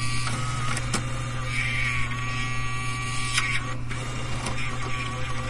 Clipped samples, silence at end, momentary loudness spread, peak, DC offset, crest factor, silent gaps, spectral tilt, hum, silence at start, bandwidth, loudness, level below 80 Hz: under 0.1%; 0 s; 6 LU; -8 dBFS; under 0.1%; 18 dB; none; -3.5 dB/octave; none; 0 s; 11.5 kHz; -28 LUFS; -36 dBFS